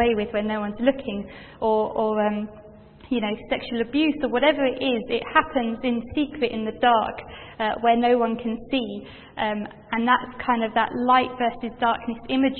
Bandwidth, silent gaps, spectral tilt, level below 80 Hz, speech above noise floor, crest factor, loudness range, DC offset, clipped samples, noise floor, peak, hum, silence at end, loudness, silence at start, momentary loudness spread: 4.4 kHz; none; -9.5 dB/octave; -52 dBFS; 23 dB; 20 dB; 3 LU; under 0.1%; under 0.1%; -46 dBFS; -2 dBFS; none; 0 s; -24 LUFS; 0 s; 10 LU